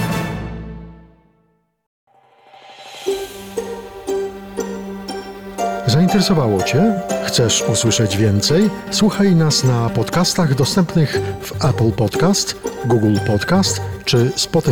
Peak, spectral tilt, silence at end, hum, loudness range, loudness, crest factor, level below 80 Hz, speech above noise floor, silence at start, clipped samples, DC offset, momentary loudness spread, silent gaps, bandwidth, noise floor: -6 dBFS; -5 dB/octave; 0 s; none; 14 LU; -17 LUFS; 12 dB; -42 dBFS; 46 dB; 0 s; under 0.1%; under 0.1%; 14 LU; 1.87-2.07 s; 19 kHz; -62 dBFS